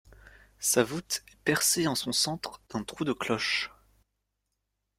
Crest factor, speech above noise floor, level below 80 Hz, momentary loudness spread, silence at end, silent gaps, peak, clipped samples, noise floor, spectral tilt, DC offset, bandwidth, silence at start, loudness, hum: 22 dB; 53 dB; -62 dBFS; 13 LU; 1.3 s; none; -8 dBFS; under 0.1%; -82 dBFS; -2.5 dB/octave; under 0.1%; 16.5 kHz; 0.1 s; -29 LUFS; none